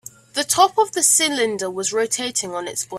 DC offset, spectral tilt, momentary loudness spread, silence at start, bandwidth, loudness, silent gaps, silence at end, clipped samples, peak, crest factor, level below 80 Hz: under 0.1%; -0.5 dB/octave; 11 LU; 0.35 s; 16 kHz; -19 LUFS; none; 0 s; under 0.1%; -2 dBFS; 20 dB; -66 dBFS